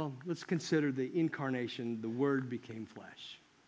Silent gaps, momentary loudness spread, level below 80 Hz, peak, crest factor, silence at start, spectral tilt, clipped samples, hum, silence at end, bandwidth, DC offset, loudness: none; 16 LU; -80 dBFS; -20 dBFS; 18 dB; 0 s; -6.5 dB/octave; under 0.1%; none; 0.3 s; 8 kHz; under 0.1%; -36 LUFS